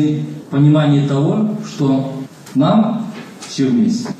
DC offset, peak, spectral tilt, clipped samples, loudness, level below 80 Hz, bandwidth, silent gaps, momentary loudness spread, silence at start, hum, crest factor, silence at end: under 0.1%; -2 dBFS; -7.5 dB/octave; under 0.1%; -16 LUFS; -66 dBFS; 9.8 kHz; none; 13 LU; 0 s; none; 14 dB; 0 s